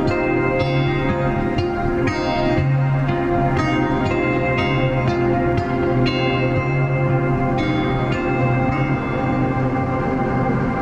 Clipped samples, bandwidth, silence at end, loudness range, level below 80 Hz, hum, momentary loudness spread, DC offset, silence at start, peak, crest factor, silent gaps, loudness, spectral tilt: under 0.1%; 7.8 kHz; 0 s; 1 LU; -34 dBFS; none; 2 LU; under 0.1%; 0 s; -6 dBFS; 12 dB; none; -19 LUFS; -8 dB/octave